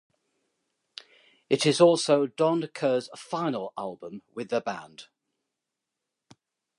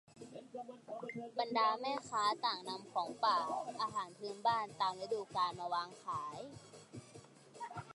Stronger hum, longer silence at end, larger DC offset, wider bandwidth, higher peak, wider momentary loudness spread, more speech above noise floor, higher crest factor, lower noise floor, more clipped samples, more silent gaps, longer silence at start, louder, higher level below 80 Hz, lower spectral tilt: neither; first, 1.75 s vs 0 s; neither; about the same, 11.5 kHz vs 11.5 kHz; first, -6 dBFS vs -22 dBFS; first, 26 LU vs 20 LU; first, 60 dB vs 20 dB; about the same, 22 dB vs 18 dB; first, -86 dBFS vs -59 dBFS; neither; neither; first, 1.5 s vs 0.1 s; first, -26 LUFS vs -38 LUFS; about the same, -80 dBFS vs -80 dBFS; first, -5 dB/octave vs -3.5 dB/octave